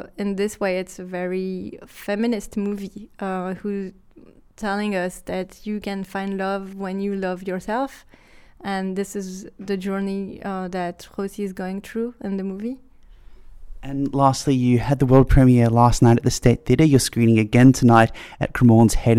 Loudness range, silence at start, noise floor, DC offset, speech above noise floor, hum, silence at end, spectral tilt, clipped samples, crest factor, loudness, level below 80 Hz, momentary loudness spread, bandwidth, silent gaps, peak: 12 LU; 0 s; -49 dBFS; under 0.1%; 29 dB; none; 0 s; -6.5 dB/octave; under 0.1%; 18 dB; -21 LUFS; -34 dBFS; 16 LU; 14.5 kHz; none; -2 dBFS